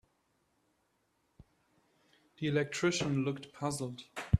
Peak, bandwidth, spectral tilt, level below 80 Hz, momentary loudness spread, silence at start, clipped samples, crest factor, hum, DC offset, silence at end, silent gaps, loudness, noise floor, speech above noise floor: -12 dBFS; 13.5 kHz; -5.5 dB/octave; -52 dBFS; 9 LU; 2.4 s; under 0.1%; 24 dB; none; under 0.1%; 0 s; none; -35 LUFS; -77 dBFS; 43 dB